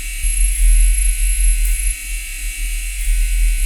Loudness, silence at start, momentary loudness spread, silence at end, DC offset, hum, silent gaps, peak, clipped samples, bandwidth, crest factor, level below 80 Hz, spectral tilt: -19 LUFS; 0 s; 9 LU; 0 s; under 0.1%; none; none; -4 dBFS; under 0.1%; 15.5 kHz; 12 dB; -16 dBFS; -1 dB/octave